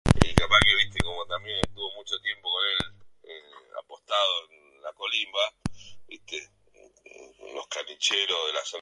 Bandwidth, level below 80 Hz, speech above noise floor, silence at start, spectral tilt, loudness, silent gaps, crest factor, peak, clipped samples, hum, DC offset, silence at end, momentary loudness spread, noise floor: 15.5 kHz; -42 dBFS; 29 dB; 0.05 s; -3.5 dB/octave; -25 LUFS; none; 28 dB; 0 dBFS; under 0.1%; none; under 0.1%; 0 s; 23 LU; -58 dBFS